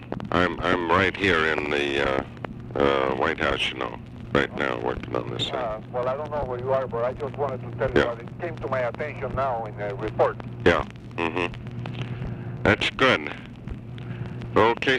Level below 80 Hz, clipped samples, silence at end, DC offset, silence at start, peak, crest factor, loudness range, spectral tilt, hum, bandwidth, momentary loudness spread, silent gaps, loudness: -44 dBFS; under 0.1%; 0 s; under 0.1%; 0 s; -8 dBFS; 18 dB; 4 LU; -6 dB/octave; none; 11.5 kHz; 13 LU; none; -25 LUFS